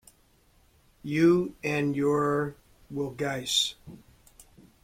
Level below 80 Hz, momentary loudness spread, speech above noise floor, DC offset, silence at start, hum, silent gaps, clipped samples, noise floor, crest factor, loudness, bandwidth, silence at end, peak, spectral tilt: -60 dBFS; 14 LU; 36 dB; under 0.1%; 1.05 s; none; none; under 0.1%; -63 dBFS; 18 dB; -27 LUFS; 16 kHz; 0.85 s; -12 dBFS; -4.5 dB/octave